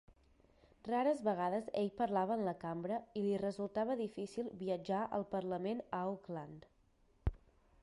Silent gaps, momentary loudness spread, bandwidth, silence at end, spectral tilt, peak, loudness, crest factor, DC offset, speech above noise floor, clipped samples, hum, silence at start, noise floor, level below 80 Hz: none; 9 LU; 11.5 kHz; 0.45 s; -7.5 dB/octave; -24 dBFS; -39 LUFS; 16 dB; under 0.1%; 33 dB; under 0.1%; none; 0.1 s; -72 dBFS; -56 dBFS